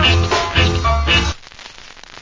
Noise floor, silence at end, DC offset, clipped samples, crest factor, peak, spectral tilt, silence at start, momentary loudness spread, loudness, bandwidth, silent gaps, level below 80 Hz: -38 dBFS; 0 s; under 0.1%; under 0.1%; 16 dB; 0 dBFS; -4 dB/octave; 0 s; 22 LU; -15 LUFS; 7.6 kHz; none; -22 dBFS